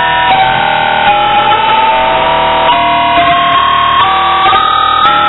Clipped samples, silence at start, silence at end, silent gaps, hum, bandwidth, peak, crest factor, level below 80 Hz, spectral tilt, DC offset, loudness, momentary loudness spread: under 0.1%; 0 s; 0 s; none; none; 5.4 kHz; 0 dBFS; 8 dB; -34 dBFS; -6.5 dB/octave; under 0.1%; -8 LUFS; 2 LU